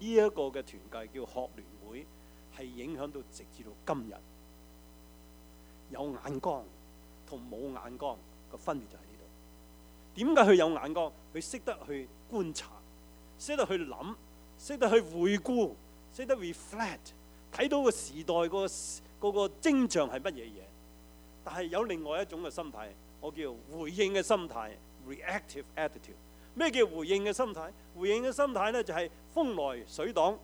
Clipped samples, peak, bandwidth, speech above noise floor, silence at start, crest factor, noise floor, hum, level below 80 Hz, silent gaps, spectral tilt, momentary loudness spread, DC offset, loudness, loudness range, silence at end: under 0.1%; -8 dBFS; over 20 kHz; 22 dB; 0 s; 26 dB; -55 dBFS; none; -58 dBFS; none; -4.5 dB/octave; 20 LU; under 0.1%; -33 LUFS; 13 LU; 0 s